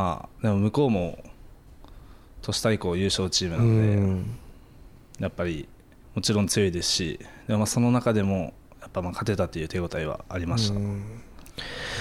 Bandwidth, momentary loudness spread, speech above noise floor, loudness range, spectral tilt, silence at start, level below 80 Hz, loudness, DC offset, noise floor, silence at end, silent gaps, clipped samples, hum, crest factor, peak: 14.5 kHz; 14 LU; 24 dB; 3 LU; -5 dB/octave; 0 s; -48 dBFS; -26 LUFS; under 0.1%; -49 dBFS; 0 s; none; under 0.1%; none; 14 dB; -12 dBFS